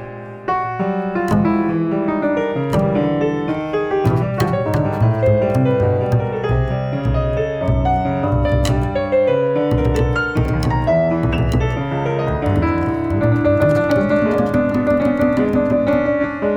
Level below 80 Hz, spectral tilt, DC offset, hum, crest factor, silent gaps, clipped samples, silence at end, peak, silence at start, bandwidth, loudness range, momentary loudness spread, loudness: -30 dBFS; -8 dB/octave; under 0.1%; none; 14 dB; none; under 0.1%; 0 s; -2 dBFS; 0 s; 16 kHz; 2 LU; 5 LU; -17 LUFS